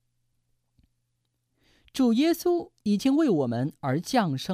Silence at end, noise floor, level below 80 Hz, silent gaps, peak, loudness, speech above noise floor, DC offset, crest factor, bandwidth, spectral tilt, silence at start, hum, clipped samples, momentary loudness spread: 0 s; -77 dBFS; -66 dBFS; none; -10 dBFS; -25 LUFS; 52 dB; under 0.1%; 16 dB; 15.5 kHz; -6 dB/octave; 1.95 s; none; under 0.1%; 7 LU